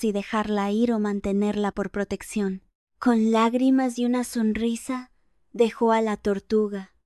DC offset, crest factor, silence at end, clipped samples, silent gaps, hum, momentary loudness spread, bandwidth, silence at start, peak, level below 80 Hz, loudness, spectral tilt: under 0.1%; 16 dB; 0.2 s; under 0.1%; 2.75-2.87 s; none; 9 LU; 12.5 kHz; 0 s; -8 dBFS; -52 dBFS; -24 LUFS; -6 dB/octave